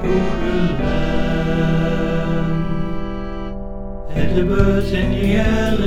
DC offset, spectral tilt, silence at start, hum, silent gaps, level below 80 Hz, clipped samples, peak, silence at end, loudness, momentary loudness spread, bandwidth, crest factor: under 0.1%; -7.5 dB/octave; 0 s; none; none; -24 dBFS; under 0.1%; -2 dBFS; 0 s; -19 LUFS; 12 LU; 13 kHz; 16 dB